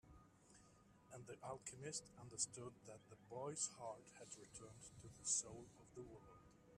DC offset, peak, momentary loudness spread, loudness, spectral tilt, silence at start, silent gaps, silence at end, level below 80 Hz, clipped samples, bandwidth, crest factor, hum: under 0.1%; -28 dBFS; 25 LU; -49 LUFS; -2.5 dB/octave; 0.05 s; none; 0 s; -78 dBFS; under 0.1%; 14 kHz; 26 dB; none